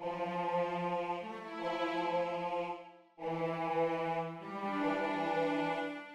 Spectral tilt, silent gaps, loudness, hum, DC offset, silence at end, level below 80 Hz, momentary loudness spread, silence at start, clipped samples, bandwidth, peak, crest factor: -6.5 dB/octave; none; -36 LUFS; none; under 0.1%; 0 s; -76 dBFS; 8 LU; 0 s; under 0.1%; 11 kHz; -22 dBFS; 14 dB